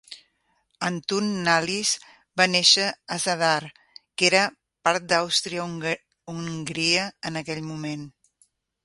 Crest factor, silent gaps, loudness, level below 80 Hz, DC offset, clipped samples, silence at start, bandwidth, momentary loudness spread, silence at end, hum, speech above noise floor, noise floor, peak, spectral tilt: 24 dB; none; -23 LUFS; -66 dBFS; under 0.1%; under 0.1%; 0.1 s; 11.5 kHz; 15 LU; 0.75 s; none; 46 dB; -70 dBFS; -2 dBFS; -2.5 dB/octave